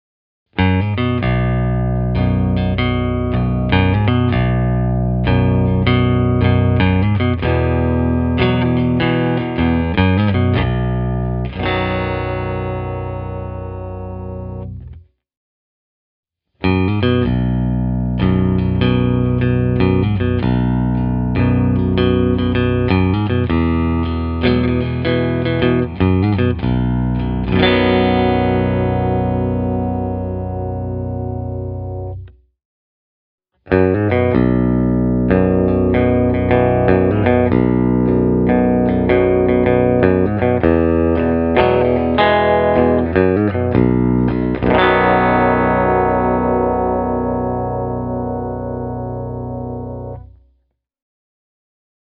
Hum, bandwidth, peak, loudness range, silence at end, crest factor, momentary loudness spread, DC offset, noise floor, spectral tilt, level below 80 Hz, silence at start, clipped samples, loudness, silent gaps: 60 Hz at -45 dBFS; 5 kHz; 0 dBFS; 9 LU; 1.8 s; 16 dB; 10 LU; under 0.1%; -64 dBFS; -6.5 dB/octave; -28 dBFS; 0.55 s; under 0.1%; -16 LUFS; 15.37-16.23 s, 32.65-33.38 s